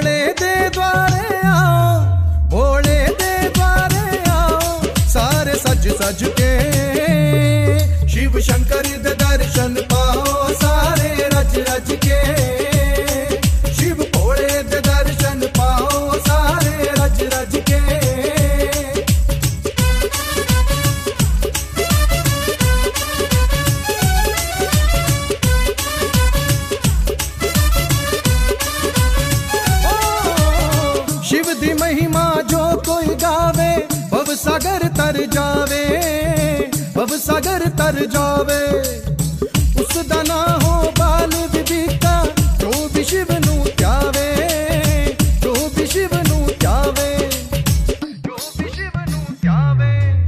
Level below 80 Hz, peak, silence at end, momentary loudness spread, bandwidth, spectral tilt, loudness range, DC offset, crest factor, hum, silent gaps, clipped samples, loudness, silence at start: -20 dBFS; -2 dBFS; 0 s; 4 LU; 15.5 kHz; -4.5 dB/octave; 2 LU; under 0.1%; 14 dB; none; none; under 0.1%; -16 LUFS; 0 s